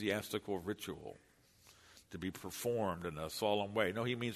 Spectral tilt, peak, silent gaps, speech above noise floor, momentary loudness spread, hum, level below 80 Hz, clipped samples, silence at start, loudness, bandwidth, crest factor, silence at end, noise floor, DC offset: -4.5 dB/octave; -18 dBFS; none; 27 dB; 13 LU; none; -68 dBFS; under 0.1%; 0 s; -39 LUFS; 13.5 kHz; 22 dB; 0 s; -66 dBFS; under 0.1%